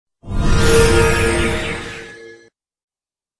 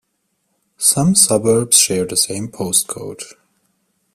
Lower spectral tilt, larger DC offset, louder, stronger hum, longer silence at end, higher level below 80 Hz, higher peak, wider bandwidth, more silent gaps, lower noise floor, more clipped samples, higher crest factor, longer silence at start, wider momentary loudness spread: first, -4.5 dB/octave vs -3 dB/octave; neither; about the same, -16 LUFS vs -14 LUFS; neither; first, 1.05 s vs 0.85 s; first, -22 dBFS vs -54 dBFS; about the same, 0 dBFS vs 0 dBFS; second, 11 kHz vs 16 kHz; neither; first, under -90 dBFS vs -69 dBFS; neither; about the same, 16 dB vs 18 dB; second, 0.25 s vs 0.8 s; about the same, 18 LU vs 17 LU